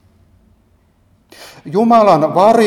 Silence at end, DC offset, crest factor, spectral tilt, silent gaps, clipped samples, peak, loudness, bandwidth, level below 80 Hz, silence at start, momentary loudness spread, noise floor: 0 s; under 0.1%; 14 dB; -6.5 dB/octave; none; under 0.1%; 0 dBFS; -11 LUFS; 14 kHz; -56 dBFS; 1.65 s; 12 LU; -54 dBFS